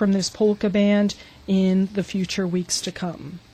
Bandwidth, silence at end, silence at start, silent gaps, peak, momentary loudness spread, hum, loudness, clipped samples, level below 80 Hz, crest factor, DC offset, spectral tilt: 12.5 kHz; 0.15 s; 0 s; none; -8 dBFS; 12 LU; none; -22 LUFS; under 0.1%; -52 dBFS; 14 dB; under 0.1%; -5.5 dB/octave